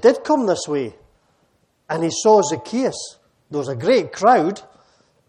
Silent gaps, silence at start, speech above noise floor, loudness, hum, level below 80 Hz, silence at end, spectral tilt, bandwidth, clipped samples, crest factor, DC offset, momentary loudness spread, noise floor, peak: none; 0 s; 45 dB; -19 LUFS; none; -64 dBFS; 0.7 s; -4.5 dB/octave; 10.5 kHz; under 0.1%; 18 dB; under 0.1%; 15 LU; -63 dBFS; -2 dBFS